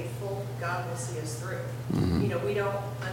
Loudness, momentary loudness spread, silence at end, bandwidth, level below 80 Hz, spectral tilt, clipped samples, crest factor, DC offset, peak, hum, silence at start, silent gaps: -31 LUFS; 7 LU; 0 s; 17 kHz; -50 dBFS; -6 dB/octave; under 0.1%; 16 dB; under 0.1%; -16 dBFS; none; 0 s; none